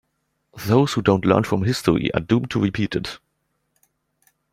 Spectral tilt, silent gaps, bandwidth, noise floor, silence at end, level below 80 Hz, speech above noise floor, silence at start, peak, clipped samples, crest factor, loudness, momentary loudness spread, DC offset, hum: -6.5 dB/octave; none; 16 kHz; -72 dBFS; 1.35 s; -50 dBFS; 53 dB; 0.55 s; -2 dBFS; under 0.1%; 20 dB; -20 LUFS; 11 LU; under 0.1%; none